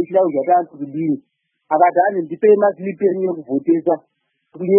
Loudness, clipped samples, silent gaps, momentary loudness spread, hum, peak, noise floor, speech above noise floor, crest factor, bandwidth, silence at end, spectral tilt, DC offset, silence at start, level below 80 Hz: -18 LUFS; under 0.1%; none; 10 LU; none; -2 dBFS; -45 dBFS; 28 dB; 16 dB; 3.2 kHz; 0 s; -13 dB/octave; under 0.1%; 0 s; -74 dBFS